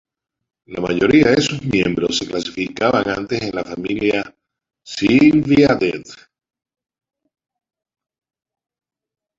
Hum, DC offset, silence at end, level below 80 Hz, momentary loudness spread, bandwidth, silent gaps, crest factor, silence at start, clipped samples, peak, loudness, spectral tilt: none; under 0.1%; 3.25 s; -48 dBFS; 12 LU; 7.8 kHz; none; 18 dB; 0.7 s; under 0.1%; -2 dBFS; -17 LUFS; -5.5 dB/octave